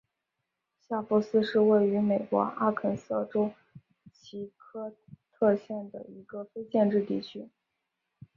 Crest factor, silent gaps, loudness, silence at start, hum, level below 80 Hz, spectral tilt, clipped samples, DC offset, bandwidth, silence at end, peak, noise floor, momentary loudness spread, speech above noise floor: 18 dB; none; -28 LUFS; 0.9 s; none; -72 dBFS; -8 dB/octave; under 0.1%; under 0.1%; 7.2 kHz; 0.9 s; -12 dBFS; -84 dBFS; 18 LU; 56 dB